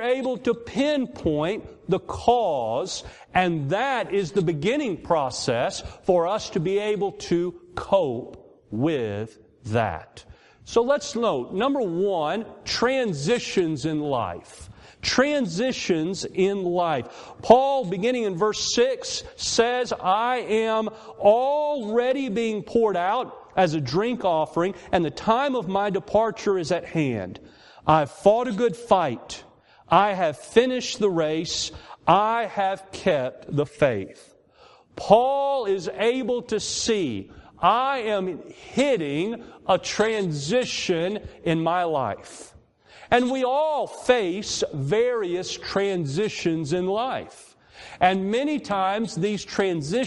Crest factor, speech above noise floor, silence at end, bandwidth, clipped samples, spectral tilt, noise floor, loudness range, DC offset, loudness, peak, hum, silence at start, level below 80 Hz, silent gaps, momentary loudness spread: 22 dB; 31 dB; 0 s; 11.5 kHz; under 0.1%; -4.5 dB/octave; -54 dBFS; 3 LU; under 0.1%; -24 LUFS; -2 dBFS; none; 0 s; -56 dBFS; none; 9 LU